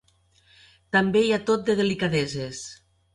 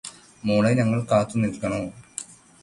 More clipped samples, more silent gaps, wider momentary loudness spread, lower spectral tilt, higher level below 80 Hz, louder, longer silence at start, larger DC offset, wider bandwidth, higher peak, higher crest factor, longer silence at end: neither; neither; second, 13 LU vs 16 LU; second, -5 dB/octave vs -6.5 dB/octave; about the same, -58 dBFS vs -54 dBFS; about the same, -24 LUFS vs -23 LUFS; first, 0.95 s vs 0.05 s; neither; about the same, 11.5 kHz vs 11.5 kHz; about the same, -8 dBFS vs -8 dBFS; about the same, 16 dB vs 18 dB; about the same, 0.4 s vs 0.3 s